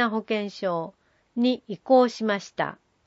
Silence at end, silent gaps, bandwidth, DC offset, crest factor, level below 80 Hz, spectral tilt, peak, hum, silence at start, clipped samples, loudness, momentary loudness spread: 0.3 s; none; 8 kHz; under 0.1%; 18 dB; -74 dBFS; -5.5 dB/octave; -8 dBFS; none; 0 s; under 0.1%; -25 LUFS; 12 LU